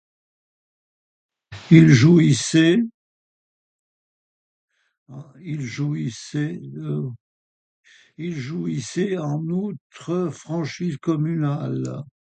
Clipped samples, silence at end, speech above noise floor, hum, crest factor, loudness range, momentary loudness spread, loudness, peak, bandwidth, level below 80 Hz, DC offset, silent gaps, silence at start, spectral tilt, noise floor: under 0.1%; 0.25 s; over 70 dB; none; 22 dB; 13 LU; 18 LU; -21 LUFS; 0 dBFS; 9.2 kHz; -60 dBFS; under 0.1%; 2.94-4.68 s, 4.98-5.06 s, 7.20-7.84 s, 9.81-9.90 s; 1.5 s; -6.5 dB/octave; under -90 dBFS